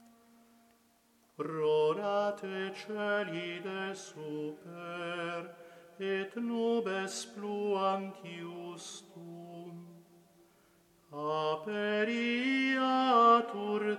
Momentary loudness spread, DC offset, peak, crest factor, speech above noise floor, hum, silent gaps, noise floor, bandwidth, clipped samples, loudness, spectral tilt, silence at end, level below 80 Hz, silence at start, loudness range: 18 LU; under 0.1%; -12 dBFS; 22 dB; 35 dB; none; none; -68 dBFS; 13.5 kHz; under 0.1%; -33 LUFS; -4.5 dB/octave; 0 s; -88 dBFS; 1.4 s; 10 LU